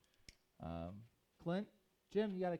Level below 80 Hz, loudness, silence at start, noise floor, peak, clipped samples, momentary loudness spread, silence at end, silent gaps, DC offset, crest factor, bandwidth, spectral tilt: -68 dBFS; -45 LUFS; 0.3 s; -67 dBFS; -28 dBFS; under 0.1%; 24 LU; 0 s; none; under 0.1%; 18 dB; 11.5 kHz; -8 dB/octave